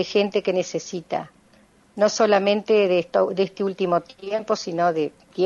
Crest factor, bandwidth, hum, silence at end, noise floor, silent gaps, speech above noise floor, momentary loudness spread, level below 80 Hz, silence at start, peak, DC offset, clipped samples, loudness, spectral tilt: 16 dB; 7.6 kHz; none; 0 s; -56 dBFS; none; 34 dB; 11 LU; -66 dBFS; 0 s; -6 dBFS; under 0.1%; under 0.1%; -22 LUFS; -4.5 dB/octave